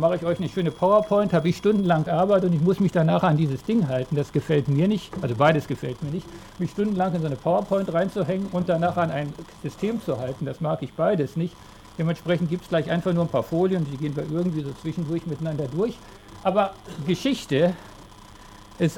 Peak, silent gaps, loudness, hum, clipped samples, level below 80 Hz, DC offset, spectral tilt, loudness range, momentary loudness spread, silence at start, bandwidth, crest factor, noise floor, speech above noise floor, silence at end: -6 dBFS; none; -24 LUFS; none; under 0.1%; -52 dBFS; under 0.1%; -7.5 dB/octave; 5 LU; 10 LU; 0 s; 15 kHz; 18 dB; -45 dBFS; 22 dB; 0 s